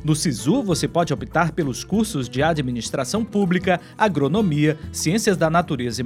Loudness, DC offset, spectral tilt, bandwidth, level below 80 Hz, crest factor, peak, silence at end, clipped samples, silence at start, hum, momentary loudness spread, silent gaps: -21 LUFS; under 0.1%; -5.5 dB/octave; 16 kHz; -44 dBFS; 18 dB; -2 dBFS; 0 s; under 0.1%; 0 s; none; 5 LU; none